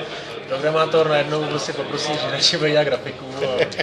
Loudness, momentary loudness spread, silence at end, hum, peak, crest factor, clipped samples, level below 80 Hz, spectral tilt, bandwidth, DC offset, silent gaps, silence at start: -20 LUFS; 10 LU; 0 s; none; -2 dBFS; 18 dB; under 0.1%; -58 dBFS; -3.5 dB/octave; 11 kHz; under 0.1%; none; 0 s